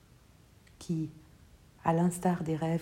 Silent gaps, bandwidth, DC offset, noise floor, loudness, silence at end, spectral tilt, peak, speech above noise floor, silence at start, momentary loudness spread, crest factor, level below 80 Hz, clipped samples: none; 15.5 kHz; under 0.1%; -60 dBFS; -32 LUFS; 0 s; -7 dB/octave; -14 dBFS; 29 dB; 0.8 s; 11 LU; 20 dB; -62 dBFS; under 0.1%